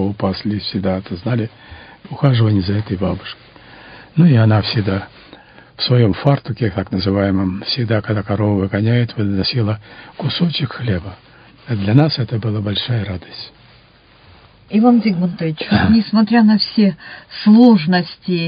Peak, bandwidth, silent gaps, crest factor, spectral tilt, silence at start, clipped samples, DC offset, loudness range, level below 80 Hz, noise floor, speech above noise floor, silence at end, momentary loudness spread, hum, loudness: 0 dBFS; 5.2 kHz; none; 16 dB; -10.5 dB/octave; 0 s; under 0.1%; under 0.1%; 6 LU; -40 dBFS; -48 dBFS; 32 dB; 0 s; 14 LU; none; -16 LUFS